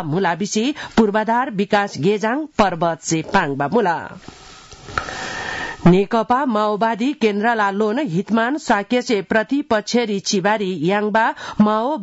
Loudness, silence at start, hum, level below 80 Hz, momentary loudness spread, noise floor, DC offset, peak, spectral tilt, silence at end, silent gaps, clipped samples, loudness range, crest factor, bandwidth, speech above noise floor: -19 LUFS; 0 s; none; -48 dBFS; 8 LU; -39 dBFS; under 0.1%; -4 dBFS; -5 dB/octave; 0 s; none; under 0.1%; 2 LU; 14 dB; 8 kHz; 21 dB